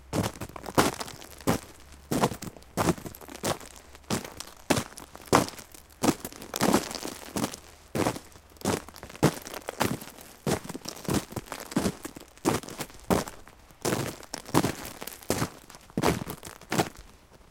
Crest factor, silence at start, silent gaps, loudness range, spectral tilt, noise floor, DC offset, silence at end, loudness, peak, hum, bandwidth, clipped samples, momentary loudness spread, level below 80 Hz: 28 dB; 0 s; none; 3 LU; -4.5 dB/octave; -52 dBFS; under 0.1%; 0.15 s; -30 LUFS; -4 dBFS; none; 17 kHz; under 0.1%; 16 LU; -52 dBFS